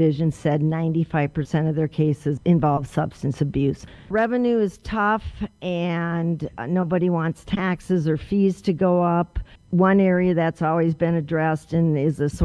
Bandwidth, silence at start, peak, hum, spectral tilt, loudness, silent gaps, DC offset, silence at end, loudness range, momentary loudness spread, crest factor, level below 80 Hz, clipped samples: 11 kHz; 0 s; -4 dBFS; none; -8.5 dB/octave; -22 LUFS; none; under 0.1%; 0 s; 3 LU; 7 LU; 16 dB; -42 dBFS; under 0.1%